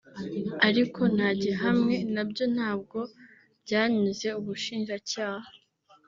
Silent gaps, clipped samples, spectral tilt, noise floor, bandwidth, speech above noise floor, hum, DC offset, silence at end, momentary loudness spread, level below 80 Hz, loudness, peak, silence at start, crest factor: none; under 0.1%; -4 dB/octave; -62 dBFS; 7.6 kHz; 34 dB; none; under 0.1%; 0.5 s; 12 LU; -68 dBFS; -28 LUFS; -6 dBFS; 0.15 s; 22 dB